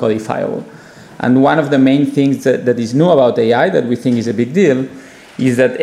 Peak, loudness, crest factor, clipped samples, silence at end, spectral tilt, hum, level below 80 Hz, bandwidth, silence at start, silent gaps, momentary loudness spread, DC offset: 0 dBFS; -13 LUFS; 12 dB; under 0.1%; 0 s; -7 dB/octave; none; -58 dBFS; 12.5 kHz; 0 s; none; 9 LU; under 0.1%